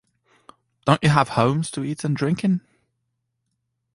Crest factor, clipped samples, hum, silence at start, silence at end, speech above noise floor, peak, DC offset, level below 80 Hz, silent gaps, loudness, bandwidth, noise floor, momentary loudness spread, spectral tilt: 20 dB; under 0.1%; none; 0.85 s; 1.35 s; 56 dB; -2 dBFS; under 0.1%; -54 dBFS; none; -21 LUFS; 11.5 kHz; -76 dBFS; 9 LU; -6 dB/octave